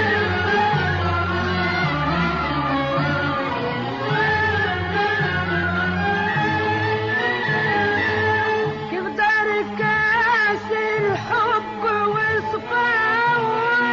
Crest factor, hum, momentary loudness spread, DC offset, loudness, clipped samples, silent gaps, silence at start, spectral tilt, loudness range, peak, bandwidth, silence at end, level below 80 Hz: 12 dB; none; 5 LU; under 0.1%; -20 LUFS; under 0.1%; none; 0 s; -3 dB/octave; 2 LU; -8 dBFS; 7.4 kHz; 0 s; -46 dBFS